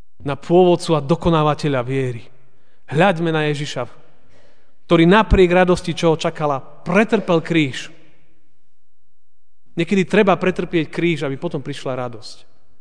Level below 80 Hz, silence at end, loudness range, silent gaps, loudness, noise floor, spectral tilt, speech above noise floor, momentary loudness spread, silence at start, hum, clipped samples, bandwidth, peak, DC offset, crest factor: -34 dBFS; 0.45 s; 5 LU; none; -18 LUFS; -71 dBFS; -6.5 dB/octave; 54 dB; 14 LU; 0.25 s; none; under 0.1%; 10 kHz; 0 dBFS; 2%; 18 dB